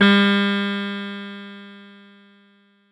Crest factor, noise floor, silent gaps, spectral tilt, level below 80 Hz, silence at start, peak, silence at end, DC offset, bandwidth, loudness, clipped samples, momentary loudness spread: 18 dB; -57 dBFS; none; -6.5 dB/octave; -70 dBFS; 0 s; -4 dBFS; 1.05 s; under 0.1%; 9.8 kHz; -20 LUFS; under 0.1%; 24 LU